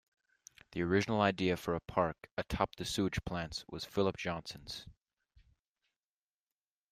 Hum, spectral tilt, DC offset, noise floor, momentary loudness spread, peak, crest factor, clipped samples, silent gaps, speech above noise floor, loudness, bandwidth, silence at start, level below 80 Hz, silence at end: none; -5.5 dB/octave; under 0.1%; under -90 dBFS; 12 LU; -14 dBFS; 24 dB; under 0.1%; 2.31-2.37 s; over 55 dB; -36 LUFS; 15.5 kHz; 0.7 s; -58 dBFS; 2 s